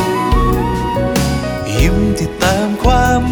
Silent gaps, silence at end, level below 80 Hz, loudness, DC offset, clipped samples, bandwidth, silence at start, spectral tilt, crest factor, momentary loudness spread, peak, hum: none; 0 s; -20 dBFS; -15 LUFS; under 0.1%; under 0.1%; over 20 kHz; 0 s; -5.5 dB/octave; 12 dB; 4 LU; 0 dBFS; none